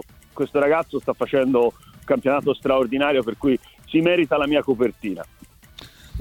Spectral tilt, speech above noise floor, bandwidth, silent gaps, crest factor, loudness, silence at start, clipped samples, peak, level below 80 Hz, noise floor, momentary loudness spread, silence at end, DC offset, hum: -6.5 dB/octave; 25 dB; 17.5 kHz; none; 16 dB; -21 LUFS; 0.35 s; under 0.1%; -6 dBFS; -50 dBFS; -45 dBFS; 12 LU; 0 s; under 0.1%; none